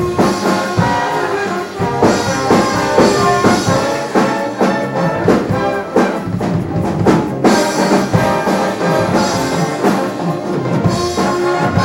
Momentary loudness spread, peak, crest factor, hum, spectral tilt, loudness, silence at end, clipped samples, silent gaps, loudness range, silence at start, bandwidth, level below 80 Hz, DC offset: 6 LU; 0 dBFS; 14 dB; none; -5.5 dB/octave; -14 LUFS; 0 s; under 0.1%; none; 2 LU; 0 s; 17 kHz; -40 dBFS; under 0.1%